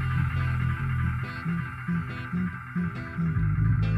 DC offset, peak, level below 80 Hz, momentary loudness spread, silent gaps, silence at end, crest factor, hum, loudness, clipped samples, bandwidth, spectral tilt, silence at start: under 0.1%; -14 dBFS; -38 dBFS; 6 LU; none; 0 s; 12 dB; none; -29 LUFS; under 0.1%; 5.6 kHz; -8.5 dB/octave; 0 s